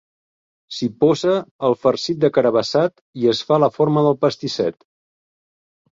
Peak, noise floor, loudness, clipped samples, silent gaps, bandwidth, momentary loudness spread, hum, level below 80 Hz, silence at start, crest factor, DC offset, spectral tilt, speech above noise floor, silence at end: -2 dBFS; under -90 dBFS; -19 LUFS; under 0.1%; 1.51-1.59 s, 3.01-3.13 s; 7.8 kHz; 7 LU; none; -60 dBFS; 0.7 s; 16 dB; under 0.1%; -6 dB/octave; over 72 dB; 1.2 s